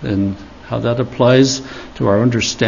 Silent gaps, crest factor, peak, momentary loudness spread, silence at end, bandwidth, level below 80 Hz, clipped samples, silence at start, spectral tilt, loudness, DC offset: none; 16 dB; 0 dBFS; 13 LU; 0 s; 7.4 kHz; -42 dBFS; under 0.1%; 0 s; -5.5 dB/octave; -16 LUFS; under 0.1%